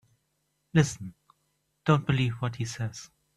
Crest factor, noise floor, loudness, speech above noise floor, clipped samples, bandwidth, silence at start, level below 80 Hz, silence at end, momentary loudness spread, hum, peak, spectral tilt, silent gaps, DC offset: 22 dB; -76 dBFS; -28 LUFS; 49 dB; under 0.1%; 12.5 kHz; 0.75 s; -58 dBFS; 0.3 s; 16 LU; none; -8 dBFS; -6 dB/octave; none; under 0.1%